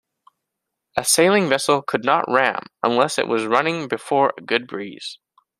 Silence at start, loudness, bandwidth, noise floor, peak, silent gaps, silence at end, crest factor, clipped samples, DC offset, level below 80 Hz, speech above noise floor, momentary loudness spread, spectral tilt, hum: 0.95 s; -19 LUFS; 15.5 kHz; -81 dBFS; 0 dBFS; none; 0.45 s; 20 dB; under 0.1%; under 0.1%; -64 dBFS; 61 dB; 13 LU; -3 dB/octave; none